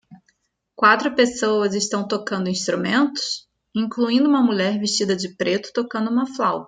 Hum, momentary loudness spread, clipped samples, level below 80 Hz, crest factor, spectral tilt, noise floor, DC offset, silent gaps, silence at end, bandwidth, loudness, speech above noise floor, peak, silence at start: none; 9 LU; under 0.1%; -64 dBFS; 20 dB; -4 dB/octave; -67 dBFS; under 0.1%; none; 0 s; 9.4 kHz; -20 LUFS; 47 dB; -2 dBFS; 0.1 s